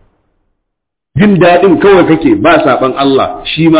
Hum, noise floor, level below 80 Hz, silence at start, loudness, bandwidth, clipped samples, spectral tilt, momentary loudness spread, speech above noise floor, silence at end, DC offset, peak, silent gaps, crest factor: none; -74 dBFS; -38 dBFS; 1.15 s; -7 LUFS; 4 kHz; 0.1%; -10.5 dB/octave; 6 LU; 67 dB; 0 s; under 0.1%; 0 dBFS; none; 8 dB